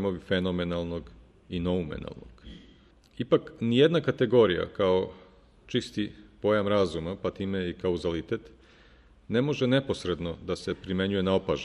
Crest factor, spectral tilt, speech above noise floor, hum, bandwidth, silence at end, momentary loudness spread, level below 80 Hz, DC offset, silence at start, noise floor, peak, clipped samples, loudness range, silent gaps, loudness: 20 dB; -6.5 dB/octave; 30 dB; none; 11 kHz; 0 s; 13 LU; -52 dBFS; under 0.1%; 0 s; -57 dBFS; -8 dBFS; under 0.1%; 5 LU; none; -28 LUFS